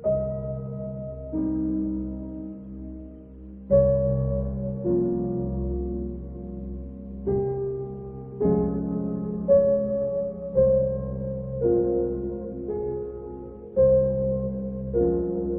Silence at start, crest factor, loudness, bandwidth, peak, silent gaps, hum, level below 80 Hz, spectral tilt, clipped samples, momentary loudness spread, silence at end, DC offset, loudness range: 0 s; 16 dB; -26 LUFS; 2.1 kHz; -8 dBFS; none; none; -38 dBFS; -14.5 dB/octave; under 0.1%; 17 LU; 0 s; under 0.1%; 6 LU